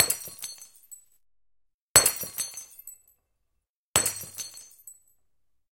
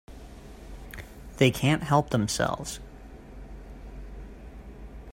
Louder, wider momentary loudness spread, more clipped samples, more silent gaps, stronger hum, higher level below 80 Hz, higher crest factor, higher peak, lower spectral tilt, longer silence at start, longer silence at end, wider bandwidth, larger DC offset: about the same, -24 LUFS vs -26 LUFS; first, 27 LU vs 23 LU; neither; first, 1.74-1.95 s, 3.69-3.94 s vs none; neither; second, -60 dBFS vs -44 dBFS; first, 32 dB vs 24 dB; first, 0 dBFS vs -8 dBFS; second, 0 dB/octave vs -5 dB/octave; about the same, 0 s vs 0.1 s; first, 0.8 s vs 0 s; about the same, 17 kHz vs 16 kHz; neither